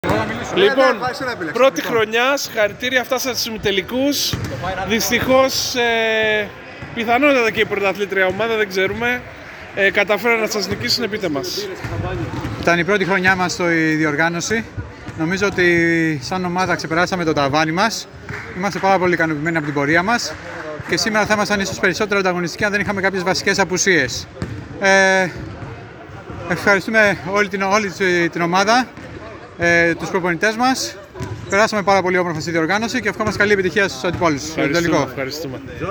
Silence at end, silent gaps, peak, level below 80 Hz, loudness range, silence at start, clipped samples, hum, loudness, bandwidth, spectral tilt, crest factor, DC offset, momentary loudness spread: 0 s; none; 0 dBFS; -44 dBFS; 2 LU; 0.05 s; under 0.1%; none; -17 LUFS; over 20 kHz; -4 dB/octave; 18 dB; under 0.1%; 13 LU